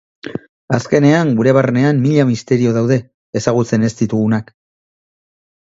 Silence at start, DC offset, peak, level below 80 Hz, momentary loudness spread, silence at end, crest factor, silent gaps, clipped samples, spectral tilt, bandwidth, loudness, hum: 0.25 s; under 0.1%; 0 dBFS; -52 dBFS; 12 LU; 1.35 s; 14 dB; 0.49-0.68 s, 3.14-3.33 s; under 0.1%; -7 dB/octave; 7.8 kHz; -15 LUFS; none